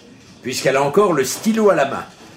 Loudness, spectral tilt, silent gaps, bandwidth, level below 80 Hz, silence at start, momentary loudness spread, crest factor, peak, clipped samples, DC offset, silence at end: -17 LUFS; -4.5 dB/octave; none; 16 kHz; -58 dBFS; 0.45 s; 11 LU; 16 dB; -2 dBFS; under 0.1%; under 0.1%; 0.1 s